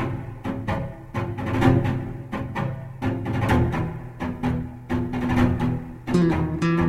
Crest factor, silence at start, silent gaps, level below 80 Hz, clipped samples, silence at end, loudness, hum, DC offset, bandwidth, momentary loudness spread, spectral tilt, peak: 20 dB; 0 s; none; -38 dBFS; under 0.1%; 0 s; -25 LUFS; none; under 0.1%; 14.5 kHz; 11 LU; -8 dB/octave; -4 dBFS